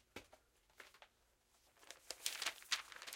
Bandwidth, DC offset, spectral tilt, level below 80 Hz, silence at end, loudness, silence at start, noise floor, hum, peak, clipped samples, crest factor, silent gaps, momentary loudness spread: 16.5 kHz; under 0.1%; 1.5 dB/octave; -82 dBFS; 0 s; -44 LUFS; 0.15 s; -77 dBFS; none; -20 dBFS; under 0.1%; 32 dB; none; 20 LU